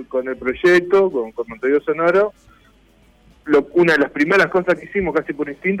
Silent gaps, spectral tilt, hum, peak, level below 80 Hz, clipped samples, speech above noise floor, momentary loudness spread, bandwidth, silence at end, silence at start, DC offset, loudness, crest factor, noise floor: none; -6.5 dB/octave; none; -6 dBFS; -50 dBFS; under 0.1%; 35 dB; 9 LU; 11.5 kHz; 0 s; 0 s; under 0.1%; -17 LUFS; 12 dB; -53 dBFS